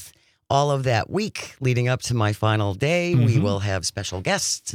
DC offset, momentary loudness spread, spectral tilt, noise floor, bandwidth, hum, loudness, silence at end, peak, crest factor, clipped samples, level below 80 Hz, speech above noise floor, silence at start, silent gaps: under 0.1%; 7 LU; -5 dB/octave; -48 dBFS; 15.5 kHz; none; -22 LUFS; 0 s; -6 dBFS; 16 dB; under 0.1%; -54 dBFS; 26 dB; 0 s; none